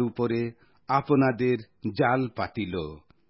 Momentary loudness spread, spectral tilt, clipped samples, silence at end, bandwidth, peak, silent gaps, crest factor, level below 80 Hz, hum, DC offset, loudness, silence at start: 12 LU; -11.5 dB/octave; under 0.1%; 0.3 s; 5.8 kHz; -8 dBFS; none; 18 dB; -54 dBFS; none; under 0.1%; -27 LUFS; 0 s